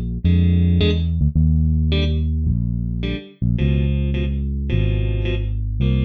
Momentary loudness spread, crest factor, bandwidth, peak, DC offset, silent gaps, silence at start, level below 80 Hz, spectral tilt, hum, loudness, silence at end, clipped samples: 7 LU; 12 dB; 4.7 kHz; -6 dBFS; under 0.1%; none; 0 s; -22 dBFS; -9.5 dB/octave; none; -20 LUFS; 0 s; under 0.1%